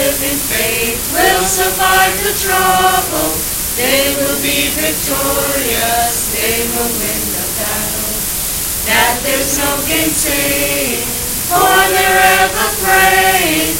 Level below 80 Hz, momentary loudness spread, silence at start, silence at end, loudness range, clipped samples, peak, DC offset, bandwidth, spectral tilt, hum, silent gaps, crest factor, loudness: -32 dBFS; 6 LU; 0 s; 0 s; 3 LU; under 0.1%; 0 dBFS; under 0.1%; 17 kHz; -1.5 dB/octave; none; none; 14 dB; -12 LUFS